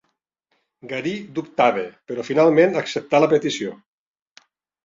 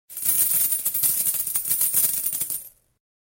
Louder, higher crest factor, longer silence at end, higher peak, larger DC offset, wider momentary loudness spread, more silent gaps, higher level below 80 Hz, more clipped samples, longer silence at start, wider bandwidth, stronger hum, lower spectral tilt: about the same, -20 LUFS vs -20 LUFS; about the same, 18 dB vs 18 dB; first, 1.1 s vs 0.7 s; first, -2 dBFS vs -6 dBFS; neither; first, 14 LU vs 7 LU; neither; second, -68 dBFS vs -62 dBFS; neither; first, 0.85 s vs 0.1 s; second, 7.6 kHz vs 17 kHz; neither; first, -5.5 dB/octave vs 1 dB/octave